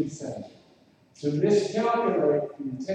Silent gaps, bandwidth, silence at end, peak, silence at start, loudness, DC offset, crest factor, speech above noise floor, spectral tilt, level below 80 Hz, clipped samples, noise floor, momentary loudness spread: none; 9.4 kHz; 0 s; -10 dBFS; 0 s; -26 LUFS; under 0.1%; 16 dB; 33 dB; -6.5 dB/octave; -70 dBFS; under 0.1%; -59 dBFS; 14 LU